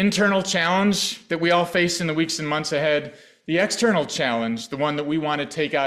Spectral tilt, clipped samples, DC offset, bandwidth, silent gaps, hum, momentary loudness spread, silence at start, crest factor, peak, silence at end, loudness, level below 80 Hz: -4 dB/octave; under 0.1%; under 0.1%; 14.5 kHz; none; none; 6 LU; 0 s; 14 dB; -8 dBFS; 0 s; -22 LUFS; -62 dBFS